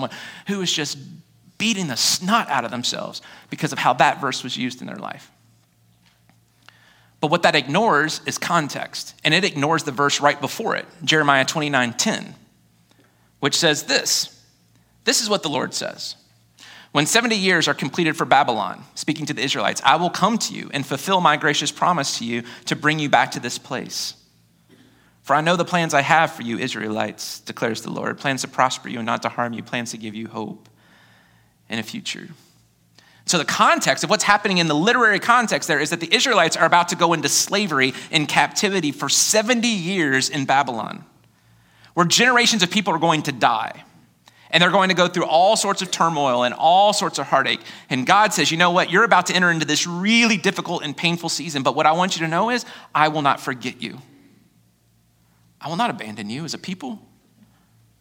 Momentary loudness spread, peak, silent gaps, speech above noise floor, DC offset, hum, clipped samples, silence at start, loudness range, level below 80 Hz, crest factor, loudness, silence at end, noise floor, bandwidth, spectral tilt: 13 LU; 0 dBFS; none; 40 dB; under 0.1%; none; under 0.1%; 0 s; 8 LU; -68 dBFS; 22 dB; -19 LUFS; 1.05 s; -60 dBFS; 17 kHz; -3 dB/octave